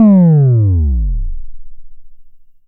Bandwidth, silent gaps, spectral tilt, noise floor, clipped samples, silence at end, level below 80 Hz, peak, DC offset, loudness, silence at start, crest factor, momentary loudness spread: 2.5 kHz; none; -15.5 dB/octave; -35 dBFS; under 0.1%; 0.25 s; -20 dBFS; -2 dBFS; under 0.1%; -11 LUFS; 0 s; 10 dB; 20 LU